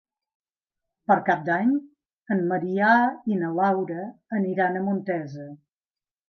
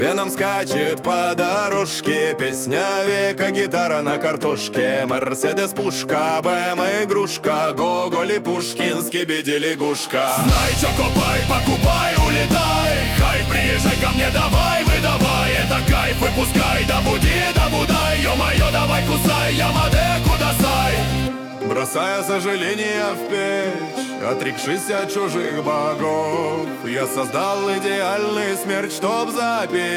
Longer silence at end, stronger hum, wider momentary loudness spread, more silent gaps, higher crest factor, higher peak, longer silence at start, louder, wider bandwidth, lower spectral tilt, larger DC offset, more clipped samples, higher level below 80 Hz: first, 0.75 s vs 0 s; neither; first, 13 LU vs 5 LU; first, 2.13-2.23 s vs none; first, 20 dB vs 14 dB; about the same, -6 dBFS vs -6 dBFS; first, 1.1 s vs 0 s; second, -24 LUFS vs -19 LUFS; second, 6.4 kHz vs 20 kHz; first, -8.5 dB/octave vs -4.5 dB/octave; neither; neither; second, -76 dBFS vs -28 dBFS